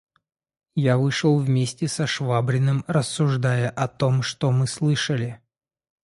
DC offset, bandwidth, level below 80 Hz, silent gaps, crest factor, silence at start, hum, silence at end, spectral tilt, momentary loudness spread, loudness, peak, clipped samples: under 0.1%; 11.5 kHz; -58 dBFS; none; 16 dB; 0.75 s; none; 0.65 s; -6 dB/octave; 5 LU; -23 LUFS; -6 dBFS; under 0.1%